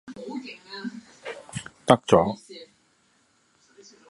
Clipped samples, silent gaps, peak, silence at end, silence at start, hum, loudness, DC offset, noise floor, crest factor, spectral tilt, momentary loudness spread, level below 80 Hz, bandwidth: under 0.1%; none; 0 dBFS; 1.45 s; 0.05 s; none; -25 LUFS; under 0.1%; -65 dBFS; 28 dB; -5.5 dB/octave; 21 LU; -58 dBFS; 11.5 kHz